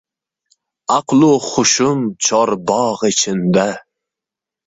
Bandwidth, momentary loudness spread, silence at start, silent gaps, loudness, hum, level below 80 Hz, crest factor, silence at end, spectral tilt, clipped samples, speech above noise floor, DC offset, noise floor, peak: 8 kHz; 6 LU; 0.9 s; none; -15 LUFS; none; -56 dBFS; 16 dB; 0.9 s; -4 dB/octave; under 0.1%; 71 dB; under 0.1%; -86 dBFS; 0 dBFS